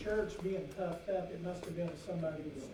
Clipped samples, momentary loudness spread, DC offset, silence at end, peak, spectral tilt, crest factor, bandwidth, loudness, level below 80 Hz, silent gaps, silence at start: under 0.1%; 5 LU; under 0.1%; 0 s; -24 dBFS; -7 dB/octave; 16 dB; 15.5 kHz; -40 LUFS; -58 dBFS; none; 0 s